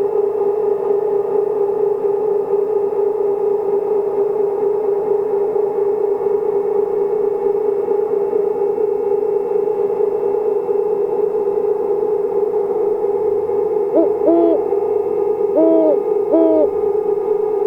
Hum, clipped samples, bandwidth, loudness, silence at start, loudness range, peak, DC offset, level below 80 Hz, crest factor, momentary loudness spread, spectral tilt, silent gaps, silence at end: none; under 0.1%; 2.8 kHz; -17 LUFS; 0 s; 3 LU; -2 dBFS; under 0.1%; -58 dBFS; 14 dB; 4 LU; -9 dB/octave; none; 0 s